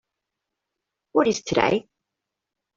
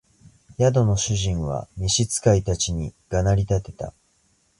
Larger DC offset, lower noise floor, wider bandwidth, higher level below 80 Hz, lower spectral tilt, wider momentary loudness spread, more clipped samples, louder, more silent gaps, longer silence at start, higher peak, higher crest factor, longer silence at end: neither; first, -85 dBFS vs -64 dBFS; second, 7.8 kHz vs 11.5 kHz; second, -58 dBFS vs -36 dBFS; about the same, -4.5 dB/octave vs -5 dB/octave; second, 5 LU vs 13 LU; neither; about the same, -23 LUFS vs -22 LUFS; neither; first, 1.15 s vs 0.6 s; about the same, -4 dBFS vs -6 dBFS; first, 24 dB vs 18 dB; first, 0.95 s vs 0.7 s